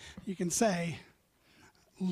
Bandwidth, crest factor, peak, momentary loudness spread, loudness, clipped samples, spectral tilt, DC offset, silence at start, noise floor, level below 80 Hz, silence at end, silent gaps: 15.5 kHz; 18 dB; -16 dBFS; 13 LU; -33 LUFS; under 0.1%; -4.5 dB/octave; under 0.1%; 0 s; -66 dBFS; -66 dBFS; 0 s; none